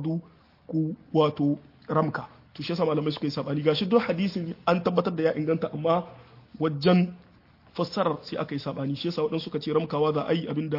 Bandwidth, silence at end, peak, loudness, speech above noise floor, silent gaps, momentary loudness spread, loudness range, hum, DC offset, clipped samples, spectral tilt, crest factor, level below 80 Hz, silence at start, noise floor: 5.8 kHz; 0 s; -8 dBFS; -27 LUFS; 30 dB; none; 9 LU; 2 LU; none; under 0.1%; under 0.1%; -8 dB/octave; 18 dB; -66 dBFS; 0 s; -56 dBFS